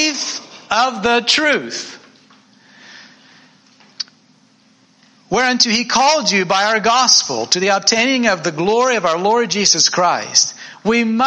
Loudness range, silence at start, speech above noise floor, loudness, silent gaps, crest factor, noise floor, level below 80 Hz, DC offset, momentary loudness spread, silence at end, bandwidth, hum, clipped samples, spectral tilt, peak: 9 LU; 0 s; 38 dB; -14 LUFS; none; 16 dB; -53 dBFS; -56 dBFS; under 0.1%; 12 LU; 0 s; 11 kHz; none; under 0.1%; -1.5 dB/octave; 0 dBFS